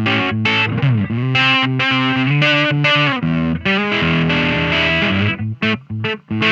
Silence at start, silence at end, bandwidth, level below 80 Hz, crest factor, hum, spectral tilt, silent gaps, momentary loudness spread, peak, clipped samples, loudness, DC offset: 0 s; 0 s; 8 kHz; -42 dBFS; 14 dB; none; -6 dB/octave; none; 6 LU; -2 dBFS; under 0.1%; -15 LUFS; under 0.1%